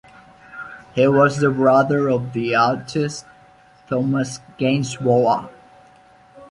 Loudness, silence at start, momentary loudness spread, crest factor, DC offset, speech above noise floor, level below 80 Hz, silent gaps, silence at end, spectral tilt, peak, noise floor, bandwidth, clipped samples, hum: -19 LUFS; 0.5 s; 20 LU; 18 dB; under 0.1%; 32 dB; -58 dBFS; none; 0.05 s; -6.5 dB/octave; -2 dBFS; -50 dBFS; 11.5 kHz; under 0.1%; none